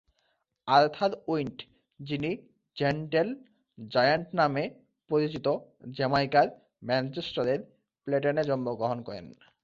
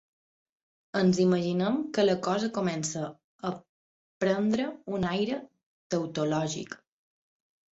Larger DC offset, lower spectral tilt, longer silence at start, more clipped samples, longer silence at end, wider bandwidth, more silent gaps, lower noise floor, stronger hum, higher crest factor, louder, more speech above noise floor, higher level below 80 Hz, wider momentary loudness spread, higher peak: neither; first, -7 dB/octave vs -5.5 dB/octave; second, 0.65 s vs 0.95 s; neither; second, 0.3 s vs 1 s; second, 7.4 kHz vs 8.2 kHz; second, none vs 3.24-3.39 s, 3.69-4.21 s, 5.66-5.90 s; second, -75 dBFS vs under -90 dBFS; neither; first, 22 dB vs 16 dB; about the same, -29 LUFS vs -29 LUFS; second, 47 dB vs over 62 dB; about the same, -66 dBFS vs -66 dBFS; first, 18 LU vs 12 LU; first, -8 dBFS vs -14 dBFS